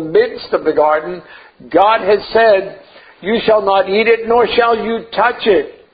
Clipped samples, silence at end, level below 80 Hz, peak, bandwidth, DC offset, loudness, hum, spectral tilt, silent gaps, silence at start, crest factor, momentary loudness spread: under 0.1%; 0.2 s; -48 dBFS; 0 dBFS; 5 kHz; under 0.1%; -13 LUFS; none; -8 dB/octave; none; 0 s; 14 dB; 8 LU